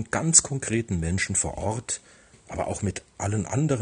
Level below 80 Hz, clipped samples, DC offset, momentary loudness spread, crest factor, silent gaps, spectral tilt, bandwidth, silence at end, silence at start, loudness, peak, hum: -46 dBFS; under 0.1%; under 0.1%; 14 LU; 24 dB; none; -4 dB/octave; 10 kHz; 0 s; 0 s; -25 LUFS; -2 dBFS; none